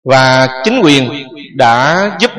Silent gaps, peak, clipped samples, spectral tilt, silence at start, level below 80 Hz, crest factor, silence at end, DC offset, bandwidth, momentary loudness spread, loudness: none; 0 dBFS; 0.3%; -4.5 dB/octave; 0.05 s; -50 dBFS; 10 dB; 0 s; under 0.1%; 11.5 kHz; 12 LU; -9 LUFS